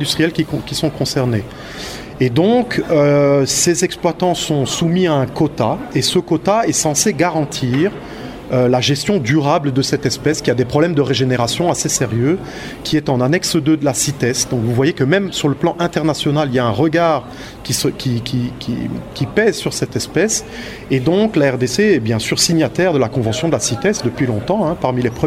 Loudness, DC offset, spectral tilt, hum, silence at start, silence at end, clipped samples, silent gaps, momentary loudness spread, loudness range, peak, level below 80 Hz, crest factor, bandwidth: -16 LUFS; under 0.1%; -4.5 dB/octave; none; 0 s; 0 s; under 0.1%; none; 7 LU; 3 LU; 0 dBFS; -42 dBFS; 16 dB; 16 kHz